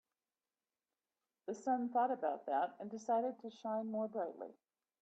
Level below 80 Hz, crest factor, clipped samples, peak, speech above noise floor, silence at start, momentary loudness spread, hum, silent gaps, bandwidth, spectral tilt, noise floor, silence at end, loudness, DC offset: under -90 dBFS; 16 dB; under 0.1%; -24 dBFS; over 51 dB; 1.45 s; 12 LU; none; none; 8.2 kHz; -6 dB/octave; under -90 dBFS; 0.5 s; -39 LUFS; under 0.1%